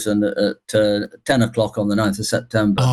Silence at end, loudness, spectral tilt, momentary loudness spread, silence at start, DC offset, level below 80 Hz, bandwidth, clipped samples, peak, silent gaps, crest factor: 0 s; -19 LUFS; -5.5 dB/octave; 4 LU; 0 s; under 0.1%; -48 dBFS; 12.5 kHz; under 0.1%; -6 dBFS; none; 14 dB